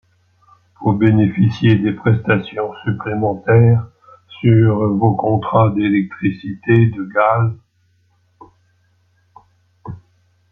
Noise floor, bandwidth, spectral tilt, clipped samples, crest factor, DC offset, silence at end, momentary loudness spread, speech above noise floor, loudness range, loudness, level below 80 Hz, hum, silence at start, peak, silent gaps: -59 dBFS; 4.6 kHz; -10 dB/octave; under 0.1%; 16 dB; under 0.1%; 0.55 s; 10 LU; 45 dB; 5 LU; -16 LUFS; -52 dBFS; none; 0.8 s; -2 dBFS; none